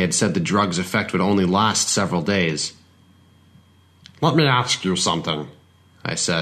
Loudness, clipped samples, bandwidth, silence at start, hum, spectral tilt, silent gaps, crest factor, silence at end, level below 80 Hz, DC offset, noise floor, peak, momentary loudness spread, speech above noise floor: -20 LUFS; under 0.1%; 13.5 kHz; 0 s; none; -4 dB/octave; none; 18 dB; 0 s; -56 dBFS; under 0.1%; -53 dBFS; -4 dBFS; 9 LU; 33 dB